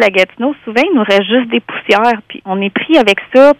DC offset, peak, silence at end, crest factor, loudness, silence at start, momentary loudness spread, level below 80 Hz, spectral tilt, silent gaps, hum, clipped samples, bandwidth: under 0.1%; 0 dBFS; 0.05 s; 12 dB; -12 LUFS; 0 s; 8 LU; -52 dBFS; -5 dB/octave; none; none; 0.8%; 13.5 kHz